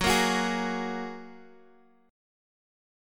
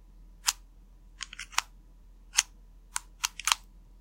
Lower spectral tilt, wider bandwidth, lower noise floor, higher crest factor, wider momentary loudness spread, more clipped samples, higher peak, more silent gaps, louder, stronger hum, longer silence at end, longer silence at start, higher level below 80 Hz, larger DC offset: first, -3.5 dB/octave vs 2.5 dB/octave; about the same, 17.5 kHz vs 16.5 kHz; first, -60 dBFS vs -54 dBFS; second, 20 dB vs 36 dB; first, 20 LU vs 14 LU; neither; second, -12 dBFS vs 0 dBFS; neither; first, -28 LUFS vs -31 LUFS; neither; first, 1 s vs 0.45 s; second, 0 s vs 0.2 s; about the same, -50 dBFS vs -54 dBFS; neither